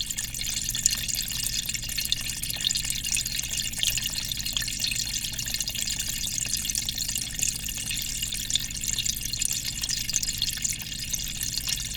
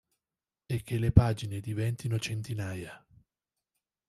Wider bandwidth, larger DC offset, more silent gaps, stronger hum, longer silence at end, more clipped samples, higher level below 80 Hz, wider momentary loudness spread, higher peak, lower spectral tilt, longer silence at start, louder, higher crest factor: first, over 20 kHz vs 13 kHz; neither; neither; first, 60 Hz at -50 dBFS vs none; second, 0 s vs 1.1 s; neither; about the same, -42 dBFS vs -46 dBFS; second, 4 LU vs 13 LU; about the same, -2 dBFS vs -4 dBFS; second, 0 dB/octave vs -6.5 dB/octave; second, 0 s vs 0.7 s; first, -26 LUFS vs -31 LUFS; about the same, 26 dB vs 28 dB